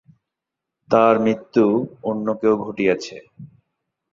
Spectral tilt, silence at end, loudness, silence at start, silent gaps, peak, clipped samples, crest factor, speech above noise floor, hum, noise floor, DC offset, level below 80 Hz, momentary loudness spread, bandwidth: -7 dB/octave; 0.65 s; -19 LUFS; 0.9 s; none; -2 dBFS; under 0.1%; 20 dB; 65 dB; none; -84 dBFS; under 0.1%; -62 dBFS; 10 LU; 7.6 kHz